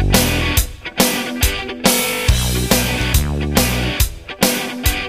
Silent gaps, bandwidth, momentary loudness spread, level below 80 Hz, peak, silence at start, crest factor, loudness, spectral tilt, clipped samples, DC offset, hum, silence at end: none; 16 kHz; 4 LU; -22 dBFS; 0 dBFS; 0 s; 16 dB; -17 LUFS; -3.5 dB/octave; under 0.1%; 0.2%; none; 0 s